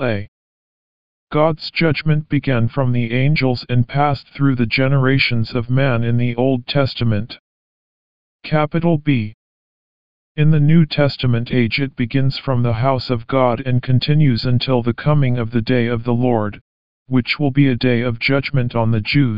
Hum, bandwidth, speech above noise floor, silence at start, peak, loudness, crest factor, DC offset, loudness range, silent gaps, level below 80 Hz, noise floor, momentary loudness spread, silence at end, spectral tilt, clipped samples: none; 5.4 kHz; over 74 dB; 0 s; -2 dBFS; -17 LUFS; 16 dB; 3%; 3 LU; 0.28-1.27 s, 7.39-8.39 s, 9.34-10.35 s, 16.61-17.06 s; -44 dBFS; under -90 dBFS; 5 LU; 0 s; -9.5 dB/octave; under 0.1%